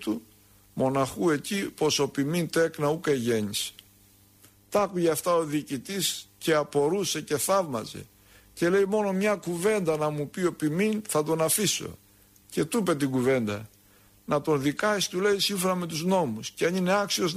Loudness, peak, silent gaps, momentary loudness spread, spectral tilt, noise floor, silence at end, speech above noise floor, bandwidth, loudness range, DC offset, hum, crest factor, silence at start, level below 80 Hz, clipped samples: -27 LUFS; -12 dBFS; none; 7 LU; -4 dB/octave; -58 dBFS; 0 s; 32 dB; 15.5 kHz; 2 LU; under 0.1%; none; 14 dB; 0 s; -62 dBFS; under 0.1%